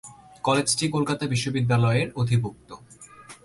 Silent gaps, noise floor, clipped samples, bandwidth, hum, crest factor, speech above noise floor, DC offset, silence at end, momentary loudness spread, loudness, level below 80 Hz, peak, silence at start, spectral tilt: none; -47 dBFS; under 0.1%; 11.5 kHz; none; 16 dB; 24 dB; under 0.1%; 0.1 s; 11 LU; -24 LUFS; -56 dBFS; -8 dBFS; 0.05 s; -5 dB/octave